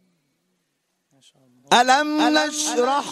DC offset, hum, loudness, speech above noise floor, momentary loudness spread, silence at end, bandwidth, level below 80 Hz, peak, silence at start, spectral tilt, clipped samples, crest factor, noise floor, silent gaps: under 0.1%; none; -18 LUFS; 53 dB; 5 LU; 0 s; 14.5 kHz; -72 dBFS; -2 dBFS; 1.7 s; -1.5 dB/octave; under 0.1%; 20 dB; -73 dBFS; none